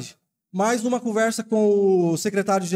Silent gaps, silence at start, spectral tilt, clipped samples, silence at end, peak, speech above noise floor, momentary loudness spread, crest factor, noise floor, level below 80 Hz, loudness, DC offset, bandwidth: none; 0 s; -5 dB/octave; under 0.1%; 0 s; -10 dBFS; 26 dB; 6 LU; 10 dB; -47 dBFS; -76 dBFS; -21 LUFS; under 0.1%; 16 kHz